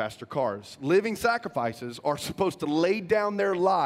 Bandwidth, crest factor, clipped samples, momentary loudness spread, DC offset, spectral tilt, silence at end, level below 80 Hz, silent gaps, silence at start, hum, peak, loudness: 16 kHz; 16 dB; under 0.1%; 7 LU; under 0.1%; -5.5 dB/octave; 0 s; -62 dBFS; none; 0 s; none; -10 dBFS; -27 LUFS